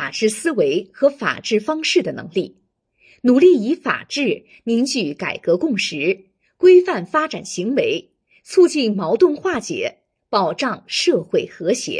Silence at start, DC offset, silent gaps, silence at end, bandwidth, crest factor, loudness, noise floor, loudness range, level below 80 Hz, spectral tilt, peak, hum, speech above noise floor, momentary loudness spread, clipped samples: 0 s; under 0.1%; none; 0 s; 10.5 kHz; 16 dB; -18 LUFS; -58 dBFS; 2 LU; -66 dBFS; -4 dB/octave; -2 dBFS; none; 41 dB; 11 LU; under 0.1%